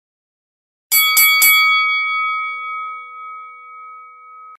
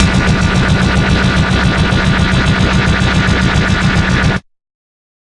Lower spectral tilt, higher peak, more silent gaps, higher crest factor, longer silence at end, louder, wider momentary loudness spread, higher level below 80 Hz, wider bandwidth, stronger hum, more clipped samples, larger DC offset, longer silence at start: second, 5 dB/octave vs -5.5 dB/octave; about the same, 0 dBFS vs 0 dBFS; neither; first, 18 dB vs 12 dB; second, 0.05 s vs 0.8 s; about the same, -12 LUFS vs -12 LUFS; first, 23 LU vs 0 LU; second, -74 dBFS vs -20 dBFS; first, 16 kHz vs 11.5 kHz; neither; neither; neither; first, 0.9 s vs 0 s